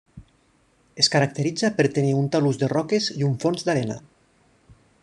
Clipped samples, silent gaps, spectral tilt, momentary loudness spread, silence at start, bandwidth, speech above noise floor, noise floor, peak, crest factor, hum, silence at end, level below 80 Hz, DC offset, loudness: under 0.1%; none; -5 dB/octave; 5 LU; 0.15 s; 10.5 kHz; 40 dB; -62 dBFS; -4 dBFS; 20 dB; none; 1.05 s; -60 dBFS; under 0.1%; -22 LUFS